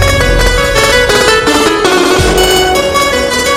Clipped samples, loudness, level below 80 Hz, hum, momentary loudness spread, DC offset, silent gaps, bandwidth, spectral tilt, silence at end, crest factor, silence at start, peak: under 0.1%; -8 LUFS; -18 dBFS; none; 3 LU; under 0.1%; none; 16.5 kHz; -3 dB/octave; 0 s; 8 dB; 0 s; 0 dBFS